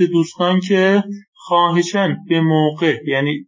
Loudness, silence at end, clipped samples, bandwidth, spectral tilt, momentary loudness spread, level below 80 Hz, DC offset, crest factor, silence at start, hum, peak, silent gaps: -16 LUFS; 0.05 s; under 0.1%; 7.6 kHz; -6 dB/octave; 5 LU; -66 dBFS; under 0.1%; 14 dB; 0 s; none; -2 dBFS; 1.28-1.33 s